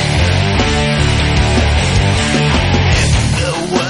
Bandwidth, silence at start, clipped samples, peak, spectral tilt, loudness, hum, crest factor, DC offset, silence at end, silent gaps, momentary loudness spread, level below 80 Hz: 11.5 kHz; 0 s; under 0.1%; 0 dBFS; -5 dB/octave; -13 LUFS; none; 12 dB; under 0.1%; 0 s; none; 1 LU; -18 dBFS